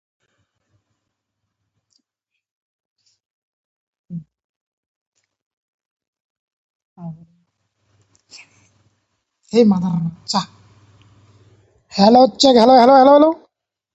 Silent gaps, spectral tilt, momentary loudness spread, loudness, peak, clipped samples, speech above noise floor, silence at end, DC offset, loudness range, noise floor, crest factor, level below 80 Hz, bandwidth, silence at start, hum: 4.44-5.12 s, 5.42-5.79 s, 5.85-5.97 s, 6.08-6.13 s, 6.20-6.96 s; -5.5 dB/octave; 26 LU; -13 LUFS; 0 dBFS; under 0.1%; 68 dB; 0.6 s; under 0.1%; 9 LU; -80 dBFS; 20 dB; -60 dBFS; 8.2 kHz; 4.1 s; none